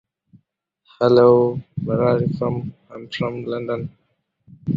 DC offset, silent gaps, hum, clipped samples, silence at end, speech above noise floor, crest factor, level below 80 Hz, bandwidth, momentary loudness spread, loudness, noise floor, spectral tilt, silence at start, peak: under 0.1%; none; none; under 0.1%; 0 s; 49 dB; 18 dB; -54 dBFS; 7.2 kHz; 19 LU; -19 LUFS; -68 dBFS; -9 dB/octave; 1 s; -2 dBFS